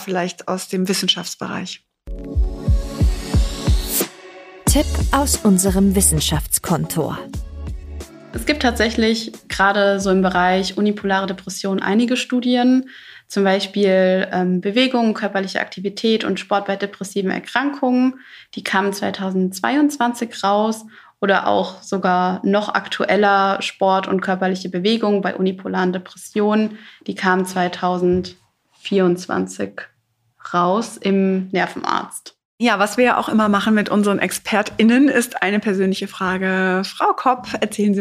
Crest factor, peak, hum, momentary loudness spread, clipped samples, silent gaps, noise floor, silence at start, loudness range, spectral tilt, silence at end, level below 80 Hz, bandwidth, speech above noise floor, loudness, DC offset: 18 dB; 0 dBFS; none; 11 LU; under 0.1%; 32.45-32.58 s; -57 dBFS; 0 s; 4 LU; -4.5 dB/octave; 0 s; -32 dBFS; 15.5 kHz; 39 dB; -19 LUFS; under 0.1%